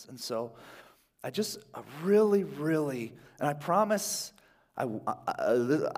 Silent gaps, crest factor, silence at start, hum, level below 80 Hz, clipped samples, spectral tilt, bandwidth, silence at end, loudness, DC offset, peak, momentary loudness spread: none; 18 dB; 0 s; none; -74 dBFS; under 0.1%; -5 dB/octave; 16 kHz; 0 s; -30 LUFS; under 0.1%; -12 dBFS; 16 LU